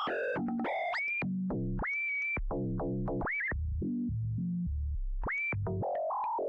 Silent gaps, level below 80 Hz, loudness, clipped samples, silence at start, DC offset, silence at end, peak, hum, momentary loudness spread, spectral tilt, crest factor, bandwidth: none; -42 dBFS; -34 LUFS; under 0.1%; 0 s; under 0.1%; 0 s; -28 dBFS; none; 4 LU; -8.5 dB/octave; 6 dB; 6.6 kHz